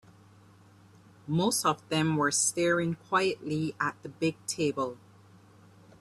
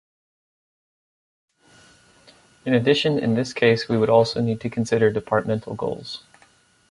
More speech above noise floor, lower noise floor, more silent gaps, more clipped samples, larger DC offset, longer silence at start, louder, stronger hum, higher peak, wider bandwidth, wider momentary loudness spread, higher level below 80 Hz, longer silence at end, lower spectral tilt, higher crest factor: second, 28 dB vs 37 dB; about the same, -57 dBFS vs -57 dBFS; neither; neither; neither; second, 1.25 s vs 2.65 s; second, -29 LUFS vs -21 LUFS; neither; second, -10 dBFS vs -4 dBFS; first, 14 kHz vs 11.5 kHz; second, 8 LU vs 11 LU; second, -68 dBFS vs -58 dBFS; first, 1.05 s vs 0.7 s; second, -4 dB/octave vs -6 dB/octave; about the same, 20 dB vs 20 dB